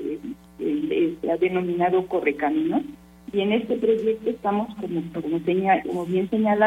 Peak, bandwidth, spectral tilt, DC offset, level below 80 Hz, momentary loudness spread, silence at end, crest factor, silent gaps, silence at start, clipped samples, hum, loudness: -8 dBFS; 13.5 kHz; -7.5 dB/octave; under 0.1%; -58 dBFS; 8 LU; 0 s; 16 dB; none; 0 s; under 0.1%; none; -24 LUFS